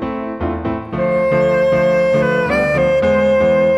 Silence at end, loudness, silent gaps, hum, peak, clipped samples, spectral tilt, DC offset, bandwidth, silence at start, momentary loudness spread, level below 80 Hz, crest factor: 0 s; -15 LUFS; none; none; -4 dBFS; under 0.1%; -7.5 dB/octave; under 0.1%; 8.2 kHz; 0 s; 9 LU; -36 dBFS; 12 dB